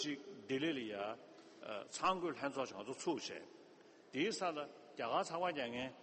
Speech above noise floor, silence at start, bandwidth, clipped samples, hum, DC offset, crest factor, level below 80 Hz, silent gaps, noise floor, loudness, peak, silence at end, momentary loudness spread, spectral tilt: 21 dB; 0 s; 8.4 kHz; under 0.1%; none; under 0.1%; 18 dB; -82 dBFS; none; -63 dBFS; -42 LUFS; -24 dBFS; 0 s; 14 LU; -3.5 dB/octave